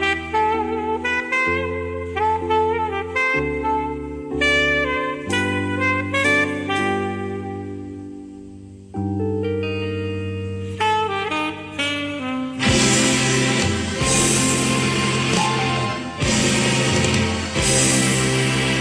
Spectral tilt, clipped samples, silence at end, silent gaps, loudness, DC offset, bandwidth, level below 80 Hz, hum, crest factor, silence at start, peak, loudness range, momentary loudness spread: -3.5 dB/octave; under 0.1%; 0 s; none; -20 LUFS; under 0.1%; 11 kHz; -40 dBFS; none; 16 dB; 0 s; -4 dBFS; 7 LU; 12 LU